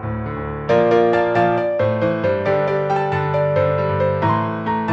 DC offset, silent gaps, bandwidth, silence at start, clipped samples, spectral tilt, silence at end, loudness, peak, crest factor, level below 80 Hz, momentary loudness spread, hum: under 0.1%; none; 7.8 kHz; 0 s; under 0.1%; -8.5 dB/octave; 0 s; -18 LUFS; -2 dBFS; 16 dB; -44 dBFS; 6 LU; none